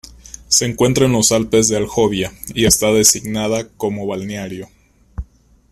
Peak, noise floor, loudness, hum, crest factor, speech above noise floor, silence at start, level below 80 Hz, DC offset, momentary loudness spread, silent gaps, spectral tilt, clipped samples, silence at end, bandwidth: 0 dBFS; -43 dBFS; -15 LUFS; none; 18 dB; 27 dB; 0.25 s; -38 dBFS; under 0.1%; 21 LU; none; -3.5 dB/octave; under 0.1%; 0.5 s; 16 kHz